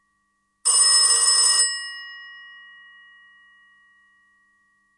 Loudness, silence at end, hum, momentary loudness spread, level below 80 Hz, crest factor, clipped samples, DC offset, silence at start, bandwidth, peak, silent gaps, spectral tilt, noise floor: -15 LUFS; 2.55 s; none; 23 LU; -88 dBFS; 20 dB; under 0.1%; under 0.1%; 0.65 s; 11.5 kHz; -4 dBFS; none; 6.5 dB/octave; -71 dBFS